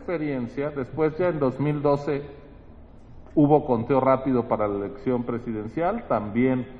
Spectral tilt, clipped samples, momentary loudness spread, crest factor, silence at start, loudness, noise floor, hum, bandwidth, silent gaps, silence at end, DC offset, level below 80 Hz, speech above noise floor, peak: -10 dB/octave; under 0.1%; 9 LU; 20 dB; 0 s; -24 LUFS; -46 dBFS; none; 6.6 kHz; none; 0 s; under 0.1%; -50 dBFS; 22 dB; -4 dBFS